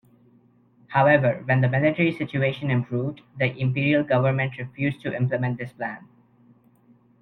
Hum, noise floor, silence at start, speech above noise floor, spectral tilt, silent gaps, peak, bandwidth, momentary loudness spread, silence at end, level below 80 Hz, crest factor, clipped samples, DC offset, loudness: none; -58 dBFS; 0.9 s; 35 dB; -9.5 dB/octave; none; -4 dBFS; 4.4 kHz; 11 LU; 1.15 s; -60 dBFS; 20 dB; under 0.1%; under 0.1%; -23 LUFS